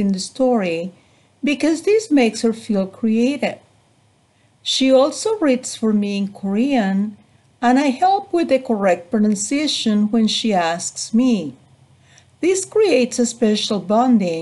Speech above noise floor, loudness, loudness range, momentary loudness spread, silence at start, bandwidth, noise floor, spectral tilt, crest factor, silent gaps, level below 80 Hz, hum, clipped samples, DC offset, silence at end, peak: 40 dB; -18 LUFS; 2 LU; 7 LU; 0 s; 12 kHz; -57 dBFS; -4.5 dB/octave; 14 dB; none; -62 dBFS; none; under 0.1%; under 0.1%; 0 s; -4 dBFS